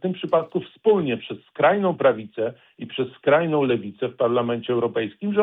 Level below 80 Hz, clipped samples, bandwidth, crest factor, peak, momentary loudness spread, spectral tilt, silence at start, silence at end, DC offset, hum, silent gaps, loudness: -66 dBFS; under 0.1%; 4 kHz; 16 dB; -6 dBFS; 11 LU; -9.5 dB/octave; 0.05 s; 0 s; under 0.1%; none; none; -22 LUFS